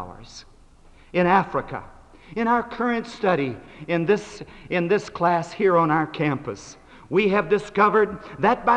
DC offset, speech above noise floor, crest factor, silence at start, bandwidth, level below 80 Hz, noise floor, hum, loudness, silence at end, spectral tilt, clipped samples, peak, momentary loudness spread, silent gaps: under 0.1%; 28 dB; 18 dB; 0 s; 9.4 kHz; -52 dBFS; -50 dBFS; none; -22 LUFS; 0 s; -6.5 dB/octave; under 0.1%; -4 dBFS; 18 LU; none